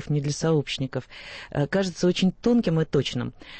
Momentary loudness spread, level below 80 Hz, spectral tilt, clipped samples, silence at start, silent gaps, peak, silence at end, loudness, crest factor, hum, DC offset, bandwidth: 10 LU; -50 dBFS; -6 dB/octave; under 0.1%; 0 s; none; -12 dBFS; 0 s; -25 LUFS; 14 dB; none; under 0.1%; 8.8 kHz